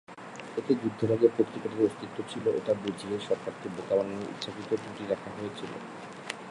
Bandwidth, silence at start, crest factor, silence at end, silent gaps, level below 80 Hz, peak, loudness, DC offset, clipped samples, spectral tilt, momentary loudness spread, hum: 11.5 kHz; 0.1 s; 22 dB; 0 s; none; -68 dBFS; -8 dBFS; -31 LUFS; under 0.1%; under 0.1%; -6 dB/octave; 14 LU; none